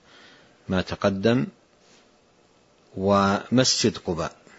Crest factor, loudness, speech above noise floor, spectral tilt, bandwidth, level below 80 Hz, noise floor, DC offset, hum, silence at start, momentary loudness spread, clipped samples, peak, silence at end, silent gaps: 20 dB; -23 LUFS; 37 dB; -4.5 dB/octave; 8 kHz; -54 dBFS; -59 dBFS; under 0.1%; none; 0.7 s; 10 LU; under 0.1%; -6 dBFS; 0.25 s; none